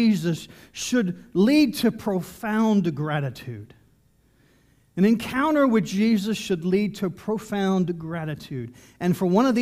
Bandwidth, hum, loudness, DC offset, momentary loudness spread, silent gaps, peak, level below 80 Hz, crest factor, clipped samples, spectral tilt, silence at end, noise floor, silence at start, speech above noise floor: 15.5 kHz; none; -23 LUFS; under 0.1%; 13 LU; none; -8 dBFS; -58 dBFS; 16 dB; under 0.1%; -6 dB/octave; 0 s; -61 dBFS; 0 s; 38 dB